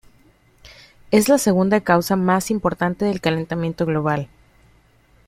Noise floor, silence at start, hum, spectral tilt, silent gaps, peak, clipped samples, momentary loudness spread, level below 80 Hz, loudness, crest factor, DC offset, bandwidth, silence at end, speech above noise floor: -55 dBFS; 0.65 s; none; -5.5 dB/octave; none; -2 dBFS; under 0.1%; 7 LU; -50 dBFS; -19 LUFS; 18 dB; under 0.1%; 16 kHz; 1 s; 37 dB